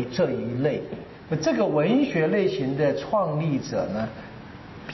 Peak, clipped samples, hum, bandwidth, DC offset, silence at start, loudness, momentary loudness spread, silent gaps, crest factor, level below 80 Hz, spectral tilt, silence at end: -12 dBFS; under 0.1%; none; 6.2 kHz; under 0.1%; 0 s; -25 LUFS; 18 LU; none; 12 dB; -56 dBFS; -6 dB/octave; 0 s